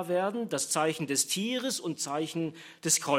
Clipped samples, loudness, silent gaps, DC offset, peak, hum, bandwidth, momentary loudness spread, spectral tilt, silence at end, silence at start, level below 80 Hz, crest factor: under 0.1%; -30 LUFS; none; under 0.1%; -12 dBFS; none; 16 kHz; 7 LU; -2.5 dB/octave; 0 s; 0 s; -78 dBFS; 18 dB